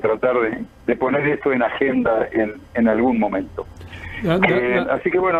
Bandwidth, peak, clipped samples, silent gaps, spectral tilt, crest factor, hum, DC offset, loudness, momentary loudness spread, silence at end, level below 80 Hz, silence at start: 7.4 kHz; -2 dBFS; under 0.1%; none; -8 dB/octave; 18 dB; none; under 0.1%; -19 LUFS; 11 LU; 0 s; -46 dBFS; 0 s